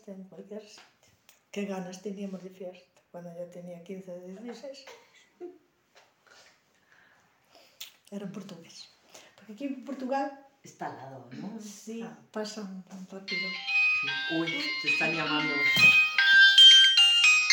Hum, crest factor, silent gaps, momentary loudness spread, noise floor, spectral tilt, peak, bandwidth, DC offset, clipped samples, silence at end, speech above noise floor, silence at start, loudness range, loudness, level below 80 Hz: none; 22 dB; none; 27 LU; -64 dBFS; -1 dB/octave; -6 dBFS; 17 kHz; under 0.1%; under 0.1%; 0 s; 32 dB; 0.1 s; 28 LU; -20 LUFS; -84 dBFS